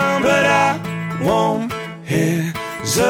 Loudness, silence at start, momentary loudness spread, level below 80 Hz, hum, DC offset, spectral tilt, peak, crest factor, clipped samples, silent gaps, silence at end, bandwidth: -18 LUFS; 0 s; 10 LU; -48 dBFS; none; under 0.1%; -4.5 dB/octave; -2 dBFS; 16 dB; under 0.1%; none; 0 s; 17.5 kHz